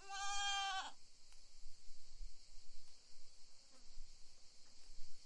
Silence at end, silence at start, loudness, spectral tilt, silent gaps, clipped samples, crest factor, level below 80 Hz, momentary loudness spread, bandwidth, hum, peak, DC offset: 0 s; 0 s; -42 LUFS; 1 dB/octave; none; under 0.1%; 14 dB; -58 dBFS; 24 LU; 11.5 kHz; none; -30 dBFS; under 0.1%